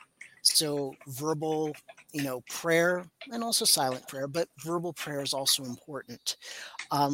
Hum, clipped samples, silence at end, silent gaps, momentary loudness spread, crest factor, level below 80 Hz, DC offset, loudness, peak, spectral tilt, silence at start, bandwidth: none; under 0.1%; 0 s; none; 16 LU; 22 dB; -74 dBFS; under 0.1%; -29 LUFS; -8 dBFS; -2.5 dB/octave; 0.2 s; 17 kHz